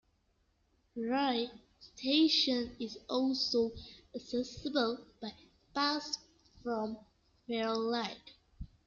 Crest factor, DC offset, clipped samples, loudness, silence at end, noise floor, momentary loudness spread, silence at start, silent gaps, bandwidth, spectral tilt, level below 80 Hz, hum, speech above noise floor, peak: 18 dB; under 0.1%; under 0.1%; -34 LUFS; 0.2 s; -75 dBFS; 18 LU; 0.95 s; none; 7.4 kHz; -3.5 dB/octave; -62 dBFS; none; 41 dB; -18 dBFS